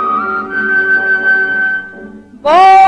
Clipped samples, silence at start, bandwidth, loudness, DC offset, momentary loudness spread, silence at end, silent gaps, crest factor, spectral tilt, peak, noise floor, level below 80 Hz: under 0.1%; 0 s; 10 kHz; -11 LUFS; under 0.1%; 11 LU; 0 s; none; 10 dB; -3.5 dB/octave; 0 dBFS; -32 dBFS; -52 dBFS